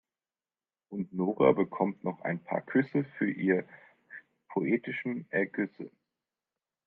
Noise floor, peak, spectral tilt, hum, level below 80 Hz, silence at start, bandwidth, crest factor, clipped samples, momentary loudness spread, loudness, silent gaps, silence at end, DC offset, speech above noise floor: under -90 dBFS; -10 dBFS; -10.5 dB/octave; none; -76 dBFS; 0.9 s; 4.5 kHz; 22 dB; under 0.1%; 22 LU; -31 LUFS; none; 1 s; under 0.1%; over 60 dB